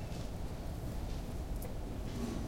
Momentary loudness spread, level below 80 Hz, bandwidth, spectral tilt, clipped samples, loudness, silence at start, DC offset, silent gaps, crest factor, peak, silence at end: 2 LU; -42 dBFS; 16.5 kHz; -6.5 dB/octave; under 0.1%; -43 LUFS; 0 s; under 0.1%; none; 14 dB; -26 dBFS; 0 s